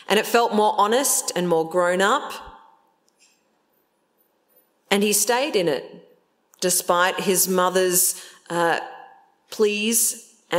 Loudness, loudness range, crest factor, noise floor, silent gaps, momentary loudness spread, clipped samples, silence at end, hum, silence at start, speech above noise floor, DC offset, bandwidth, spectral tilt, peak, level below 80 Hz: -20 LUFS; 6 LU; 22 dB; -67 dBFS; none; 11 LU; under 0.1%; 0 s; none; 0.1 s; 47 dB; under 0.1%; 16.5 kHz; -2.5 dB/octave; -2 dBFS; -68 dBFS